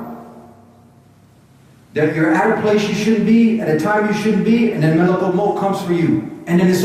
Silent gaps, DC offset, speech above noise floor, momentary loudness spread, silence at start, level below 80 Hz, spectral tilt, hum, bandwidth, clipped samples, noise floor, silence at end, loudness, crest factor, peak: none; under 0.1%; 33 dB; 6 LU; 0 s; -56 dBFS; -7 dB/octave; none; 14.5 kHz; under 0.1%; -48 dBFS; 0 s; -16 LUFS; 14 dB; -4 dBFS